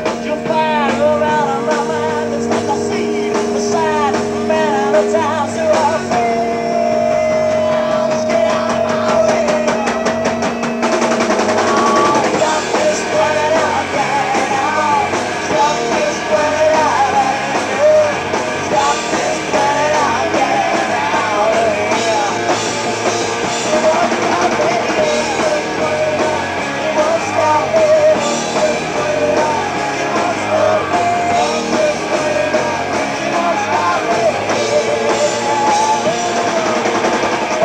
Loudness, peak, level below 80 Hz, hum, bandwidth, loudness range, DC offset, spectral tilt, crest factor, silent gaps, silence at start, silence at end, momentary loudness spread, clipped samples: -15 LUFS; -2 dBFS; -48 dBFS; none; 14 kHz; 1 LU; under 0.1%; -3.5 dB/octave; 12 dB; none; 0 s; 0 s; 4 LU; under 0.1%